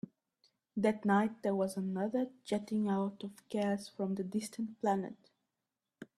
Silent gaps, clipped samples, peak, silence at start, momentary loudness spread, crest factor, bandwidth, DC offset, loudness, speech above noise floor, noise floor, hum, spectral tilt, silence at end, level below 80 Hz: none; under 0.1%; -18 dBFS; 0.75 s; 10 LU; 18 dB; 13 kHz; under 0.1%; -36 LUFS; 55 dB; -89 dBFS; none; -6.5 dB/octave; 0.15 s; -78 dBFS